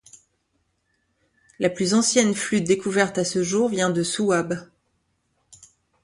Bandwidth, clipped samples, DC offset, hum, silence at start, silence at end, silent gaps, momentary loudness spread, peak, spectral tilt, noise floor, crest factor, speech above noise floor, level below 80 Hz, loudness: 11.5 kHz; under 0.1%; under 0.1%; none; 1.6 s; 0.5 s; none; 7 LU; -4 dBFS; -4 dB/octave; -71 dBFS; 20 dB; 50 dB; -62 dBFS; -22 LUFS